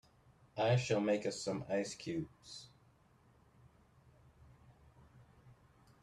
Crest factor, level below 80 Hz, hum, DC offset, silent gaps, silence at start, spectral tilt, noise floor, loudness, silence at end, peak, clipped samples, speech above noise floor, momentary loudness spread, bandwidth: 20 dB; -72 dBFS; none; under 0.1%; none; 0.55 s; -5.5 dB/octave; -68 dBFS; -37 LUFS; 0.5 s; -20 dBFS; under 0.1%; 32 dB; 19 LU; 11.5 kHz